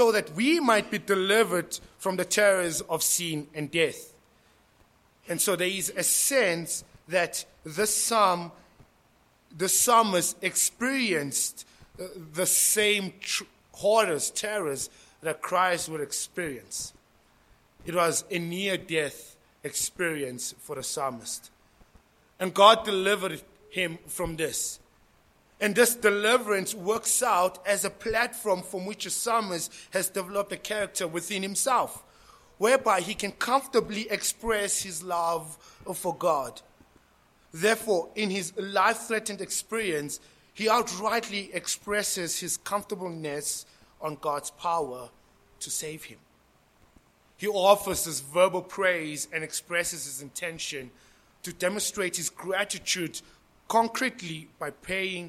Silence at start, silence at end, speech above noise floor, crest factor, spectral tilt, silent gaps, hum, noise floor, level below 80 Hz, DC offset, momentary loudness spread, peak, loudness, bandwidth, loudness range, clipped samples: 0 s; 0 s; 36 dB; 26 dB; -2 dB/octave; none; none; -63 dBFS; -62 dBFS; under 0.1%; 14 LU; -2 dBFS; -27 LUFS; 16.5 kHz; 6 LU; under 0.1%